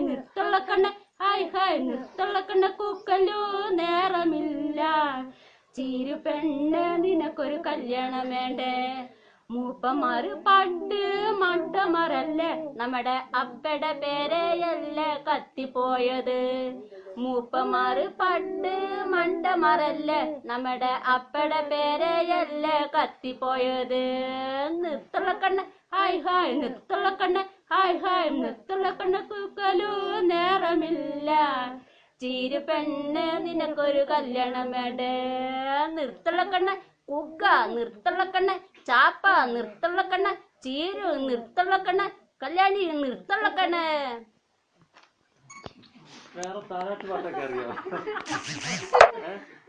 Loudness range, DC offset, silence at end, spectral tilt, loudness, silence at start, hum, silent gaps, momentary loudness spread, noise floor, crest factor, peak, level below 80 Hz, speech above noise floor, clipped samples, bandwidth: 4 LU; under 0.1%; 0.15 s; -4 dB/octave; -26 LUFS; 0 s; none; none; 10 LU; -68 dBFS; 26 dB; 0 dBFS; -66 dBFS; 41 dB; under 0.1%; 9.6 kHz